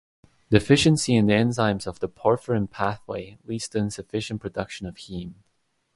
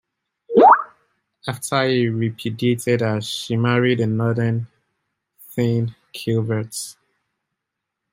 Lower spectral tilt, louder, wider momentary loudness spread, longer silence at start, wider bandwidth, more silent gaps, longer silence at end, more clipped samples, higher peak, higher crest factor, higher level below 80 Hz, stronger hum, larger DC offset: about the same, -5.5 dB/octave vs -6 dB/octave; second, -24 LUFS vs -19 LUFS; about the same, 16 LU vs 17 LU; about the same, 0.5 s vs 0.5 s; second, 11.5 kHz vs 16 kHz; neither; second, 0.65 s vs 1.2 s; neither; about the same, -2 dBFS vs -2 dBFS; about the same, 24 dB vs 20 dB; first, -50 dBFS vs -62 dBFS; neither; neither